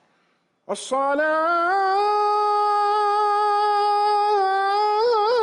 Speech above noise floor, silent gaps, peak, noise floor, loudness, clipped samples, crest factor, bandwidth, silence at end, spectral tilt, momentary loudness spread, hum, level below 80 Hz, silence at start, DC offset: 46 dB; none; -12 dBFS; -66 dBFS; -20 LUFS; under 0.1%; 8 dB; 11.5 kHz; 0 s; -2 dB/octave; 2 LU; none; -70 dBFS; 0.7 s; under 0.1%